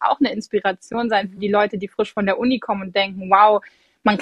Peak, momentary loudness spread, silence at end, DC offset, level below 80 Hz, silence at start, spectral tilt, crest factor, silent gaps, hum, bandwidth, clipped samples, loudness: 0 dBFS; 9 LU; 0 s; under 0.1%; -58 dBFS; 0 s; -6 dB/octave; 18 dB; none; none; 10 kHz; under 0.1%; -19 LUFS